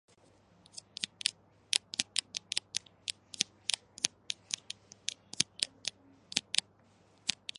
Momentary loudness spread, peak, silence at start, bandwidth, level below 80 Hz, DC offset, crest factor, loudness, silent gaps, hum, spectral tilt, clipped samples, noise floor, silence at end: 10 LU; -4 dBFS; 1 s; 11.5 kHz; -78 dBFS; under 0.1%; 36 dB; -35 LUFS; none; none; 1 dB/octave; under 0.1%; -65 dBFS; 0.25 s